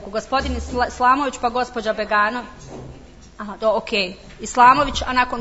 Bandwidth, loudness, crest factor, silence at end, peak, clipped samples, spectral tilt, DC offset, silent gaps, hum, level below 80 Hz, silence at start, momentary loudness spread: 8 kHz; -19 LUFS; 20 dB; 0 s; 0 dBFS; under 0.1%; -4 dB/octave; under 0.1%; none; none; -38 dBFS; 0 s; 21 LU